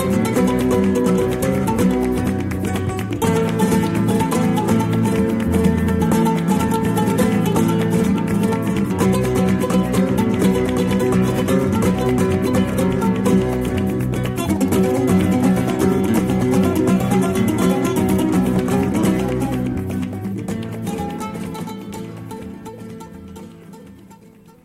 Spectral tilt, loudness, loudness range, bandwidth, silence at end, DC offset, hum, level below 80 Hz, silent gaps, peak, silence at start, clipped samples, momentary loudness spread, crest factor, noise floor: -6.5 dB/octave; -18 LUFS; 8 LU; 16 kHz; 0.5 s; under 0.1%; none; -38 dBFS; none; -4 dBFS; 0 s; under 0.1%; 10 LU; 14 dB; -45 dBFS